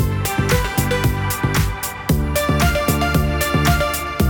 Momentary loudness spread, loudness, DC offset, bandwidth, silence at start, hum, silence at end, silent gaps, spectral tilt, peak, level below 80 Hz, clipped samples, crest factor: 4 LU; -18 LUFS; under 0.1%; 19.5 kHz; 0 s; none; 0 s; none; -5 dB/octave; -2 dBFS; -26 dBFS; under 0.1%; 16 dB